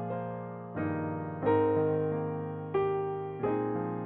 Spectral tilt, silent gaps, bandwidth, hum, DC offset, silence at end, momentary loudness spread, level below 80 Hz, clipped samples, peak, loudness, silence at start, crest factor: -8 dB/octave; none; 4 kHz; none; under 0.1%; 0 s; 9 LU; -66 dBFS; under 0.1%; -16 dBFS; -32 LUFS; 0 s; 16 dB